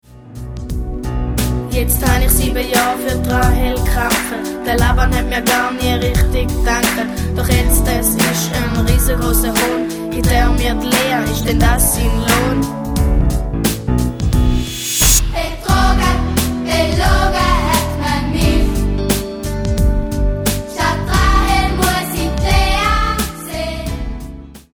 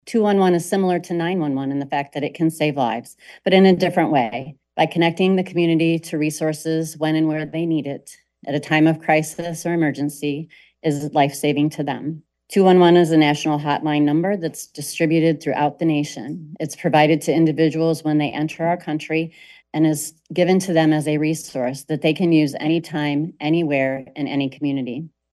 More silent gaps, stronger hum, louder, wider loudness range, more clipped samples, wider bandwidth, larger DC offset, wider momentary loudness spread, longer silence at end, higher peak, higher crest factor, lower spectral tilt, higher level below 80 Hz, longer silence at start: neither; neither; first, -16 LUFS vs -20 LUFS; about the same, 2 LU vs 4 LU; neither; first, over 20 kHz vs 12.5 kHz; neither; second, 8 LU vs 11 LU; about the same, 0.15 s vs 0.25 s; about the same, 0 dBFS vs -2 dBFS; about the same, 14 dB vs 16 dB; second, -4.5 dB/octave vs -6 dB/octave; first, -18 dBFS vs -64 dBFS; about the same, 0.15 s vs 0.05 s